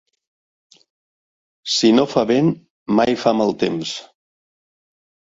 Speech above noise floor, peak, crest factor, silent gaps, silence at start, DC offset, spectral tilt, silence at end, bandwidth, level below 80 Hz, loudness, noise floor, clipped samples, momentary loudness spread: over 73 dB; 0 dBFS; 20 dB; 2.70-2.86 s; 1.65 s; under 0.1%; -5 dB/octave; 1.2 s; 7.8 kHz; -58 dBFS; -18 LUFS; under -90 dBFS; under 0.1%; 15 LU